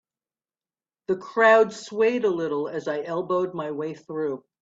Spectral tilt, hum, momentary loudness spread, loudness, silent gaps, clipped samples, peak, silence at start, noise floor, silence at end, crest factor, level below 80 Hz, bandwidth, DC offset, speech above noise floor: -5.5 dB/octave; none; 13 LU; -24 LUFS; none; under 0.1%; -4 dBFS; 1.1 s; under -90 dBFS; 0.25 s; 20 dB; -72 dBFS; 8 kHz; under 0.1%; over 66 dB